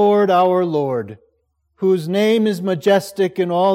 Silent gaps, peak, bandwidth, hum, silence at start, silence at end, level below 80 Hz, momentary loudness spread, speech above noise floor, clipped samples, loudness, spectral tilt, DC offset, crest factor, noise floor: none; -4 dBFS; 16 kHz; none; 0 s; 0 s; -68 dBFS; 8 LU; 50 dB; under 0.1%; -17 LUFS; -6.5 dB/octave; under 0.1%; 14 dB; -66 dBFS